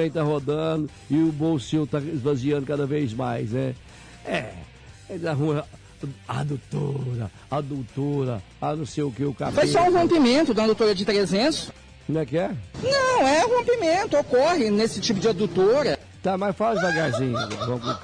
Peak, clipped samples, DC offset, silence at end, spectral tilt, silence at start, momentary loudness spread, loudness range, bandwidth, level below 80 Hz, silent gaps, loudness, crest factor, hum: -12 dBFS; under 0.1%; under 0.1%; 0 s; -5.5 dB/octave; 0 s; 11 LU; 8 LU; 10.5 kHz; -52 dBFS; none; -23 LUFS; 12 dB; none